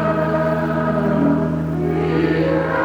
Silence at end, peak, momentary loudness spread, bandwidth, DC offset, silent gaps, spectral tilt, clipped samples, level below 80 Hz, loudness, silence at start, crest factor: 0 s; -6 dBFS; 3 LU; 7.2 kHz; under 0.1%; none; -9 dB/octave; under 0.1%; -40 dBFS; -18 LUFS; 0 s; 12 dB